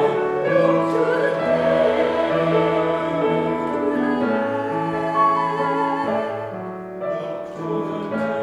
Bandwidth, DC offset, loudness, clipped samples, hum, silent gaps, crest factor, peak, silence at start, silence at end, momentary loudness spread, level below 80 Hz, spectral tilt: 11 kHz; under 0.1%; -21 LUFS; under 0.1%; none; none; 14 dB; -6 dBFS; 0 s; 0 s; 9 LU; -56 dBFS; -7 dB/octave